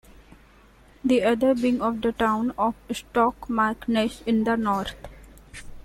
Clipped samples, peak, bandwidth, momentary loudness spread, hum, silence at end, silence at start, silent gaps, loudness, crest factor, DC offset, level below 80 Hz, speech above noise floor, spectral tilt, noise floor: under 0.1%; -8 dBFS; 16.5 kHz; 13 LU; none; 0 s; 1.05 s; none; -24 LUFS; 18 dB; under 0.1%; -48 dBFS; 30 dB; -5.5 dB/octave; -53 dBFS